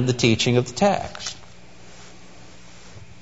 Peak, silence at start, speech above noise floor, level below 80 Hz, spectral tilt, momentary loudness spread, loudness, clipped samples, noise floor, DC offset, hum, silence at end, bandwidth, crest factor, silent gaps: -2 dBFS; 0 s; 26 dB; -52 dBFS; -5 dB/octave; 26 LU; -21 LUFS; under 0.1%; -47 dBFS; 0.7%; 60 Hz at -50 dBFS; 0.2 s; 8 kHz; 22 dB; none